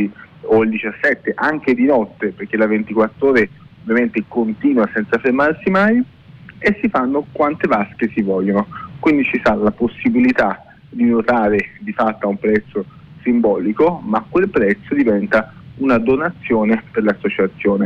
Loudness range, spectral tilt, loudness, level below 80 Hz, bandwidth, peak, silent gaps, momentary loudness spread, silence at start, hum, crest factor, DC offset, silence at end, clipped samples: 1 LU; -8.5 dB/octave; -17 LUFS; -48 dBFS; 7 kHz; -4 dBFS; none; 6 LU; 0 s; none; 12 dB; under 0.1%; 0 s; under 0.1%